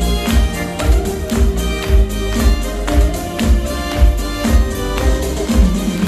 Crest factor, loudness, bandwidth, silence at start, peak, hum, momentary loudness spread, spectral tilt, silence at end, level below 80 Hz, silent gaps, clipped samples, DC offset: 14 dB; -17 LUFS; 14.5 kHz; 0 s; 0 dBFS; none; 4 LU; -5.5 dB/octave; 0 s; -16 dBFS; none; under 0.1%; under 0.1%